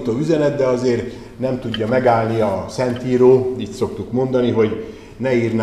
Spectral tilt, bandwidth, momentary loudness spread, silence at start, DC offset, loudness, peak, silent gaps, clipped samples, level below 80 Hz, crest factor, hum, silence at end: -7 dB/octave; 11.5 kHz; 10 LU; 0 s; 0.2%; -18 LUFS; 0 dBFS; none; under 0.1%; -46 dBFS; 16 dB; none; 0 s